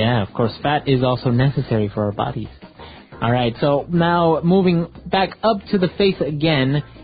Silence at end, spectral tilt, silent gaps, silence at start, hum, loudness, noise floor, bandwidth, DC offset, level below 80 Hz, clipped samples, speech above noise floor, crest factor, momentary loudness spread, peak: 0 s; -12 dB/octave; none; 0 s; none; -19 LUFS; -40 dBFS; 5 kHz; under 0.1%; -44 dBFS; under 0.1%; 22 dB; 14 dB; 6 LU; -4 dBFS